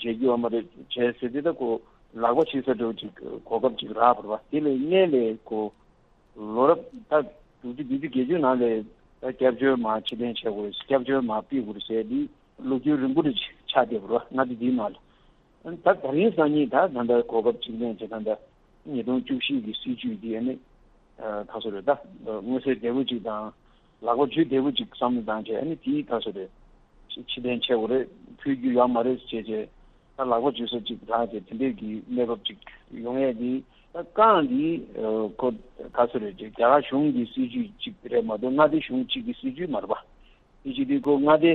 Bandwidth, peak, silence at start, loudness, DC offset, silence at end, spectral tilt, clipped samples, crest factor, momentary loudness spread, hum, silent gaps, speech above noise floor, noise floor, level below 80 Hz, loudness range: 4.2 kHz; -6 dBFS; 0 s; -26 LUFS; under 0.1%; 0 s; -8.5 dB/octave; under 0.1%; 20 dB; 13 LU; none; none; 34 dB; -59 dBFS; -58 dBFS; 5 LU